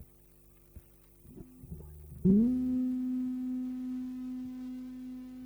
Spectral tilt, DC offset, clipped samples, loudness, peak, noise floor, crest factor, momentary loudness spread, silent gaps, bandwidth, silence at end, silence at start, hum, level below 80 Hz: -10 dB/octave; under 0.1%; under 0.1%; -33 LUFS; -16 dBFS; -60 dBFS; 18 dB; 23 LU; none; over 20 kHz; 0 s; 0 s; 50 Hz at -55 dBFS; -56 dBFS